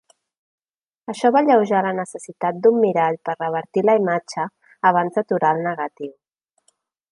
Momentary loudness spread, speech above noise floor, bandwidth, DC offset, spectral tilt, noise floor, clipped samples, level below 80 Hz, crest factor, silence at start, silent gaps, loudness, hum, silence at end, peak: 14 LU; 47 dB; 11 kHz; under 0.1%; -6 dB/octave; -66 dBFS; under 0.1%; -74 dBFS; 18 dB; 1.1 s; none; -20 LUFS; none; 1 s; -2 dBFS